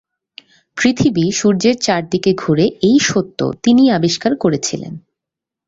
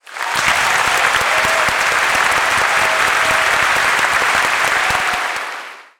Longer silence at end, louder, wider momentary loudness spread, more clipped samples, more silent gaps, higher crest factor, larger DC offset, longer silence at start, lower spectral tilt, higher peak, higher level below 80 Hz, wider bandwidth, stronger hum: first, 0.7 s vs 0.2 s; about the same, -15 LUFS vs -14 LUFS; first, 10 LU vs 5 LU; neither; neither; about the same, 14 dB vs 14 dB; neither; first, 0.75 s vs 0.1 s; first, -5 dB/octave vs -0.5 dB/octave; about the same, 0 dBFS vs 0 dBFS; about the same, -50 dBFS vs -46 dBFS; second, 8 kHz vs over 20 kHz; neither